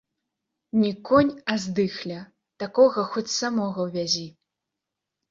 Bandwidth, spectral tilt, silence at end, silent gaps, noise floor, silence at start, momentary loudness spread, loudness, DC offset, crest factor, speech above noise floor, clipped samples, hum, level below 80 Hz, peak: 7.8 kHz; -4.5 dB/octave; 1 s; none; -85 dBFS; 0.75 s; 14 LU; -24 LUFS; under 0.1%; 20 dB; 62 dB; under 0.1%; none; -62 dBFS; -6 dBFS